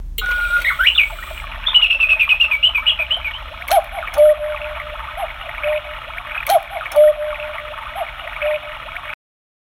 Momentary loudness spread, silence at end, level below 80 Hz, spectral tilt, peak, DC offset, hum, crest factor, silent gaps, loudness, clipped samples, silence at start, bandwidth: 17 LU; 0.5 s; -36 dBFS; -1 dB/octave; 0 dBFS; under 0.1%; none; 18 dB; none; -16 LUFS; under 0.1%; 0 s; 17 kHz